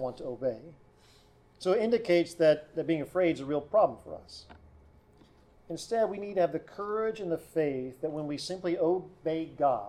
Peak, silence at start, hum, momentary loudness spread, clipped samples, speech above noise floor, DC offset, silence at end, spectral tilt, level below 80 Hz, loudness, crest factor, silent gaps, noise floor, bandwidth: -14 dBFS; 0 s; none; 12 LU; under 0.1%; 30 dB; under 0.1%; 0 s; -6 dB/octave; -64 dBFS; -30 LUFS; 18 dB; none; -60 dBFS; 13.5 kHz